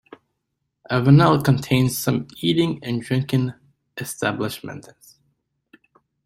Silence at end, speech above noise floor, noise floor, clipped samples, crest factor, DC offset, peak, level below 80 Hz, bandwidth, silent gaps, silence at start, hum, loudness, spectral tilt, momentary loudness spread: 1.45 s; 57 dB; -77 dBFS; under 0.1%; 20 dB; under 0.1%; -2 dBFS; -54 dBFS; 16 kHz; none; 0.9 s; none; -20 LUFS; -6 dB/octave; 19 LU